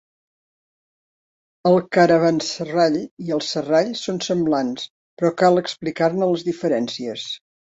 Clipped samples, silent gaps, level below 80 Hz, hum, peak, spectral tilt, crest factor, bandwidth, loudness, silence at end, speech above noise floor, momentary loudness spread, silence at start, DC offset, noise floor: under 0.1%; 3.11-3.17 s, 4.90-5.17 s; -64 dBFS; none; -2 dBFS; -5.5 dB/octave; 18 dB; 8 kHz; -20 LUFS; 0.35 s; over 70 dB; 12 LU; 1.65 s; under 0.1%; under -90 dBFS